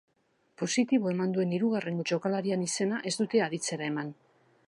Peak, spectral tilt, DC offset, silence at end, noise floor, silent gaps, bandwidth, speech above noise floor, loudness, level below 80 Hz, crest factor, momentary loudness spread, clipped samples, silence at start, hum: -14 dBFS; -5 dB/octave; under 0.1%; 0.55 s; -72 dBFS; none; 11.5 kHz; 43 dB; -30 LUFS; -80 dBFS; 16 dB; 6 LU; under 0.1%; 0.6 s; none